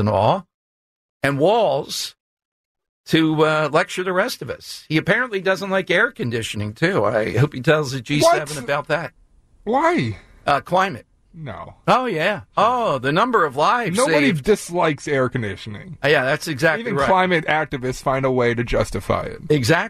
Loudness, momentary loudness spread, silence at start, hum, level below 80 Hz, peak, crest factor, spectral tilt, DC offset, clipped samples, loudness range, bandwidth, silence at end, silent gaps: -19 LUFS; 10 LU; 0 s; none; -44 dBFS; -4 dBFS; 16 dB; -5 dB/octave; under 0.1%; under 0.1%; 3 LU; 14 kHz; 0 s; 0.54-1.20 s, 2.20-2.37 s, 2.45-2.75 s, 2.89-3.04 s